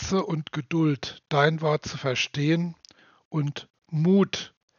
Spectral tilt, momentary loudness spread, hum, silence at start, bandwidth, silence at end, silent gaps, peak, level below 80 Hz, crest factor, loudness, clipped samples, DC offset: -5 dB/octave; 11 LU; none; 0 s; 7.2 kHz; 0.3 s; 3.25-3.31 s; -6 dBFS; -56 dBFS; 20 dB; -26 LUFS; under 0.1%; under 0.1%